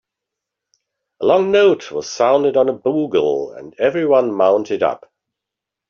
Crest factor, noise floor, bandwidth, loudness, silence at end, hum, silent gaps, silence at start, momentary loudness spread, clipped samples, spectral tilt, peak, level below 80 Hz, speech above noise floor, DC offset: 16 dB; -84 dBFS; 7.2 kHz; -16 LUFS; 0.95 s; none; none; 1.2 s; 8 LU; under 0.1%; -4 dB/octave; -2 dBFS; -62 dBFS; 68 dB; under 0.1%